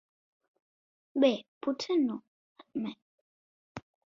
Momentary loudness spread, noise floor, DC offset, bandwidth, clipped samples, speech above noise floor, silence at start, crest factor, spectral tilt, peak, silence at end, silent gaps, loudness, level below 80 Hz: 22 LU; under -90 dBFS; under 0.1%; 7.6 kHz; under 0.1%; over 60 dB; 1.15 s; 22 dB; -5.5 dB/octave; -12 dBFS; 0.35 s; 1.48-1.61 s, 2.27-2.56 s, 3.02-3.75 s; -32 LUFS; -76 dBFS